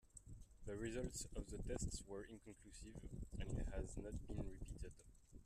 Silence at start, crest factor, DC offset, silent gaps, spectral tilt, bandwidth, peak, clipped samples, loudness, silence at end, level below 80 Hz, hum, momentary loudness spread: 0.05 s; 16 dB; under 0.1%; none; -5 dB/octave; 13.5 kHz; -32 dBFS; under 0.1%; -51 LUFS; 0 s; -54 dBFS; none; 13 LU